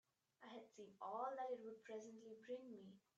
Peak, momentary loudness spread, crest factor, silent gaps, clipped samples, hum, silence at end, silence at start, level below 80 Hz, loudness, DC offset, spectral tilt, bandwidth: -34 dBFS; 13 LU; 20 dB; none; under 0.1%; none; 0.2 s; 0.4 s; under -90 dBFS; -53 LUFS; under 0.1%; -5 dB/octave; 8.2 kHz